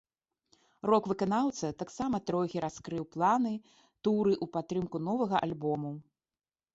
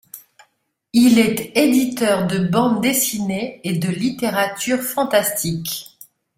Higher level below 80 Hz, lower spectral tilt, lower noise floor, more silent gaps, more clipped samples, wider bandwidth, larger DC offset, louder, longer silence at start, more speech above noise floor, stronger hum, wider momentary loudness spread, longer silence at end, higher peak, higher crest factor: second, -66 dBFS vs -56 dBFS; first, -6.5 dB/octave vs -4.5 dB/octave; first, under -90 dBFS vs -66 dBFS; neither; neither; second, 8 kHz vs 16.5 kHz; neither; second, -32 LUFS vs -18 LUFS; first, 0.85 s vs 0.15 s; first, over 59 dB vs 48 dB; neither; about the same, 9 LU vs 9 LU; first, 0.75 s vs 0.55 s; second, -14 dBFS vs -2 dBFS; about the same, 20 dB vs 16 dB